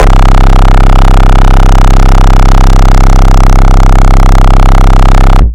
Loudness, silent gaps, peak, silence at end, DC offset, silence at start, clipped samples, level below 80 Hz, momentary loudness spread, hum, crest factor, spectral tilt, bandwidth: -6 LUFS; none; 0 dBFS; 0 s; 4%; 0 s; 60%; -2 dBFS; 0 LU; none; 0 dB; -6 dB/octave; 8.6 kHz